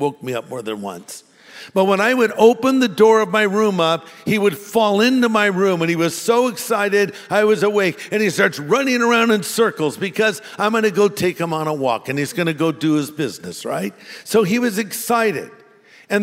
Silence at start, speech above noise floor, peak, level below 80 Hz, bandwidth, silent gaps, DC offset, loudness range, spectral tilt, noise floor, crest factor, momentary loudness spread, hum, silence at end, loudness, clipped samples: 0 s; 31 dB; 0 dBFS; -64 dBFS; 16 kHz; none; under 0.1%; 5 LU; -4.5 dB/octave; -48 dBFS; 18 dB; 12 LU; none; 0 s; -18 LUFS; under 0.1%